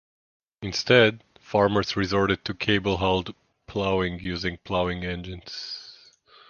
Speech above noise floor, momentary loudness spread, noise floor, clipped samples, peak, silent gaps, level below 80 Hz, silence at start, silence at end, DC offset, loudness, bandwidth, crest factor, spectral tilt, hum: 30 dB; 16 LU; -54 dBFS; under 0.1%; -2 dBFS; none; -46 dBFS; 0.6 s; 0.55 s; under 0.1%; -25 LUFS; 7.2 kHz; 24 dB; -5.5 dB/octave; none